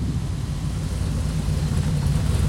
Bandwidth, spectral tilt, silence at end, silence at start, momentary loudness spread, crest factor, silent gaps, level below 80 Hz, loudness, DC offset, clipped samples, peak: 16 kHz; -6.5 dB/octave; 0 s; 0 s; 5 LU; 14 dB; none; -28 dBFS; -25 LUFS; under 0.1%; under 0.1%; -10 dBFS